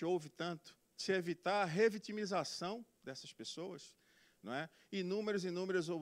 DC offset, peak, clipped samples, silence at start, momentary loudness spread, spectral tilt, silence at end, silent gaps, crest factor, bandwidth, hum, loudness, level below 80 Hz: under 0.1%; -20 dBFS; under 0.1%; 0 s; 15 LU; -5 dB/octave; 0 s; none; 20 dB; 15.5 kHz; none; -40 LUFS; -84 dBFS